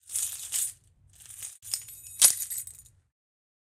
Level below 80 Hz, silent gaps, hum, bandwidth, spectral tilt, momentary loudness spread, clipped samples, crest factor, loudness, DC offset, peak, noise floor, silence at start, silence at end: -68 dBFS; none; none; 19 kHz; 2.5 dB/octave; 21 LU; under 0.1%; 30 dB; -26 LUFS; under 0.1%; -2 dBFS; -57 dBFS; 0.1 s; 0.85 s